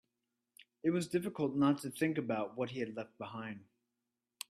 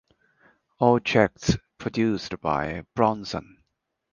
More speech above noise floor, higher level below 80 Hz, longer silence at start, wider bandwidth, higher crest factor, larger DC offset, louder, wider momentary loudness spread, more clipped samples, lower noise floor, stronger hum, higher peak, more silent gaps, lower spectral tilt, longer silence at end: about the same, 53 dB vs 54 dB; second, -78 dBFS vs -48 dBFS; about the same, 0.85 s vs 0.8 s; first, 14 kHz vs 9.8 kHz; about the same, 18 dB vs 22 dB; neither; second, -37 LUFS vs -25 LUFS; about the same, 13 LU vs 11 LU; neither; first, -89 dBFS vs -78 dBFS; neither; second, -20 dBFS vs -4 dBFS; neither; about the same, -6 dB/octave vs -6 dB/octave; first, 0.85 s vs 0.7 s